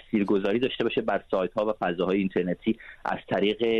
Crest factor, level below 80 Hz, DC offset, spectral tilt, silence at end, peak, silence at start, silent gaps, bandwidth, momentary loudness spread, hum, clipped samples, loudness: 14 dB; -56 dBFS; under 0.1%; -7.5 dB/octave; 0 s; -12 dBFS; 0.1 s; none; 7.4 kHz; 5 LU; none; under 0.1%; -27 LUFS